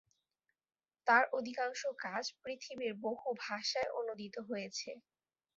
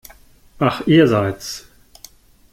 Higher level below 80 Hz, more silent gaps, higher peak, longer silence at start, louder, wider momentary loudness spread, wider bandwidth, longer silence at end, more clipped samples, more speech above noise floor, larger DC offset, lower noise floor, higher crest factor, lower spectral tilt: second, -84 dBFS vs -50 dBFS; neither; second, -14 dBFS vs -2 dBFS; first, 1.05 s vs 0.6 s; second, -37 LUFS vs -17 LUFS; about the same, 15 LU vs 17 LU; second, 7.6 kHz vs 16 kHz; second, 0.55 s vs 0.95 s; neither; first, 50 dB vs 31 dB; neither; first, -87 dBFS vs -47 dBFS; first, 24 dB vs 18 dB; second, -0.5 dB/octave vs -6 dB/octave